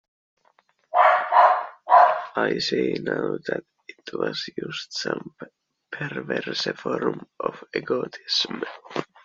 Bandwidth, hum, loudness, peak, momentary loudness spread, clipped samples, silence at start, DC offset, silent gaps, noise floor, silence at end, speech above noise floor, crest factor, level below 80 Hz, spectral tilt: 7.6 kHz; none; -23 LUFS; -2 dBFS; 16 LU; under 0.1%; 0.95 s; under 0.1%; none; -64 dBFS; 0.2 s; 36 dB; 22 dB; -70 dBFS; -1.5 dB/octave